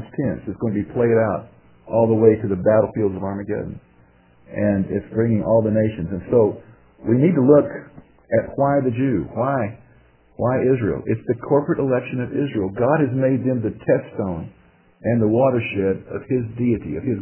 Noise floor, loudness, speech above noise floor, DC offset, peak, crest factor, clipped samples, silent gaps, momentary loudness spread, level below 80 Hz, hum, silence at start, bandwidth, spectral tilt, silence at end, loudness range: -53 dBFS; -20 LUFS; 34 dB; under 0.1%; -2 dBFS; 18 dB; under 0.1%; none; 11 LU; -46 dBFS; none; 0 s; 3.2 kHz; -12.5 dB/octave; 0 s; 3 LU